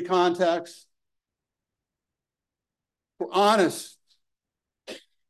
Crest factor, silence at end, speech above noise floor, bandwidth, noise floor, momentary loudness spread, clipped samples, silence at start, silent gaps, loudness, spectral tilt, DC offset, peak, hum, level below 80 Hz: 22 dB; 0.3 s; 66 dB; 12.5 kHz; -89 dBFS; 22 LU; under 0.1%; 0 s; none; -23 LUFS; -4 dB/octave; under 0.1%; -6 dBFS; none; -80 dBFS